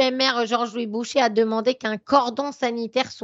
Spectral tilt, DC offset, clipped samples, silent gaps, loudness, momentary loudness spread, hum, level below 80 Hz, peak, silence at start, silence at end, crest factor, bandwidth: -3.5 dB/octave; under 0.1%; under 0.1%; none; -22 LUFS; 7 LU; none; -70 dBFS; -4 dBFS; 0 s; 0.05 s; 20 dB; 8 kHz